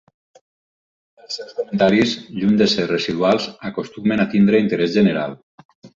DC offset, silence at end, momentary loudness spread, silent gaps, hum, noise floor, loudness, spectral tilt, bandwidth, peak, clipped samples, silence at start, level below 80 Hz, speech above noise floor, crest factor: under 0.1%; 0.1 s; 13 LU; 5.43-5.58 s, 5.65-5.69 s, 5.75-5.82 s; none; under -90 dBFS; -18 LUFS; -6 dB/octave; 7.6 kHz; -2 dBFS; under 0.1%; 1.3 s; -56 dBFS; over 72 dB; 16 dB